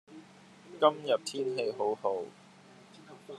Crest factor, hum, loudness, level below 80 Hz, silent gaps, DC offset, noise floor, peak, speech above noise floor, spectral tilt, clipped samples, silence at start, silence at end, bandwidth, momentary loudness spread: 24 dB; none; -31 LUFS; under -90 dBFS; none; under 0.1%; -56 dBFS; -10 dBFS; 26 dB; -4 dB/octave; under 0.1%; 0.1 s; 0 s; 12.5 kHz; 25 LU